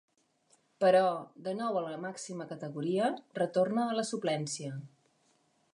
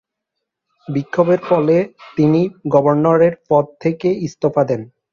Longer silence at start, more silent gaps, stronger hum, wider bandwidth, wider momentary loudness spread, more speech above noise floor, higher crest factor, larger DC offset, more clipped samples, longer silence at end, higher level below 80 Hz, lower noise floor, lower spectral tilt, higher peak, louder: about the same, 0.8 s vs 0.9 s; neither; neither; first, 11 kHz vs 7.2 kHz; first, 14 LU vs 8 LU; second, 40 dB vs 63 dB; about the same, 18 dB vs 16 dB; neither; neither; first, 0.85 s vs 0.25 s; second, -86 dBFS vs -58 dBFS; second, -71 dBFS vs -79 dBFS; second, -5 dB/octave vs -8.5 dB/octave; second, -14 dBFS vs 0 dBFS; second, -32 LUFS vs -16 LUFS